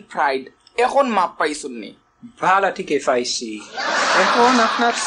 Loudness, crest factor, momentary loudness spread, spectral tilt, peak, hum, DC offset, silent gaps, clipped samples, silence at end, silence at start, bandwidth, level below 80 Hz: -18 LUFS; 14 dB; 15 LU; -2.5 dB/octave; -4 dBFS; none; under 0.1%; none; under 0.1%; 0 s; 0.1 s; 11 kHz; -62 dBFS